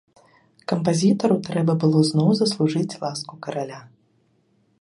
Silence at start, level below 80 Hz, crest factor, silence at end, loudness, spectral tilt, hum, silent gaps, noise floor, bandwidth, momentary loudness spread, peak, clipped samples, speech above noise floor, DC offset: 0.7 s; -64 dBFS; 18 dB; 0.95 s; -21 LUFS; -6.5 dB/octave; none; none; -64 dBFS; 11.5 kHz; 13 LU; -6 dBFS; under 0.1%; 43 dB; under 0.1%